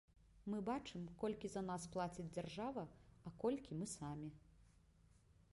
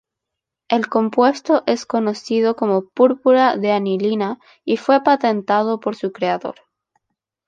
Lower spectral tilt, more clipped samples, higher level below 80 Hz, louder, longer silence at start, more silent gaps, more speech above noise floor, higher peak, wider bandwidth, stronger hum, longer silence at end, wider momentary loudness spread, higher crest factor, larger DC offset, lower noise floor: about the same, -6 dB/octave vs -6 dB/octave; neither; about the same, -70 dBFS vs -70 dBFS; second, -47 LUFS vs -18 LUFS; second, 0.15 s vs 0.7 s; neither; second, 25 dB vs 65 dB; second, -30 dBFS vs 0 dBFS; first, 11.5 kHz vs 9 kHz; neither; second, 0.1 s vs 0.95 s; first, 12 LU vs 8 LU; about the same, 18 dB vs 18 dB; neither; second, -71 dBFS vs -83 dBFS